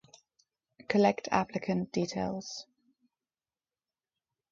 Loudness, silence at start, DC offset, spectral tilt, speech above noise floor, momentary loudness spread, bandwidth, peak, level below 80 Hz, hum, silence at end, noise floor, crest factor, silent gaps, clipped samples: -31 LUFS; 0.9 s; under 0.1%; -5.5 dB/octave; over 60 dB; 13 LU; 7.6 kHz; -12 dBFS; -68 dBFS; none; 1.9 s; under -90 dBFS; 24 dB; none; under 0.1%